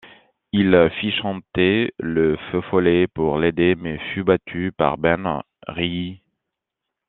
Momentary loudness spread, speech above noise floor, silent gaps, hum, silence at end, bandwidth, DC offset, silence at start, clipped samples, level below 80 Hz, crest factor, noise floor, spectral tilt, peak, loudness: 10 LU; 63 dB; none; none; 0.9 s; 4.2 kHz; under 0.1%; 0.05 s; under 0.1%; -50 dBFS; 20 dB; -83 dBFS; -4.5 dB/octave; -2 dBFS; -20 LUFS